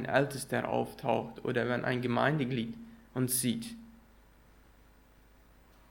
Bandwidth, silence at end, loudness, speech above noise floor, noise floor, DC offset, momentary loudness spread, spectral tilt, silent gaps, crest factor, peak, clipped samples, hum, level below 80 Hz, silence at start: 17 kHz; 2 s; -32 LUFS; 29 dB; -60 dBFS; under 0.1%; 12 LU; -5 dB/octave; none; 24 dB; -10 dBFS; under 0.1%; 60 Hz at -60 dBFS; -62 dBFS; 0 s